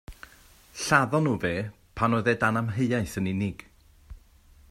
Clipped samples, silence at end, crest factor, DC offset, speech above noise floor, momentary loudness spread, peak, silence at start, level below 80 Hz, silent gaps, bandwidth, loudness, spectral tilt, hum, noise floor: under 0.1%; 0.55 s; 22 dB; under 0.1%; 30 dB; 15 LU; -6 dBFS; 0.1 s; -52 dBFS; none; 16 kHz; -26 LUFS; -5.5 dB/octave; none; -55 dBFS